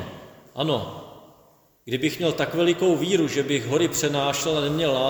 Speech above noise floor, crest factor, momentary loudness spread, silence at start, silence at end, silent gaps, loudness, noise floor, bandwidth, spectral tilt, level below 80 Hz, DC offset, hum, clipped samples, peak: 35 dB; 16 dB; 16 LU; 0 s; 0 s; none; -23 LUFS; -57 dBFS; over 20 kHz; -4.5 dB/octave; -56 dBFS; under 0.1%; none; under 0.1%; -8 dBFS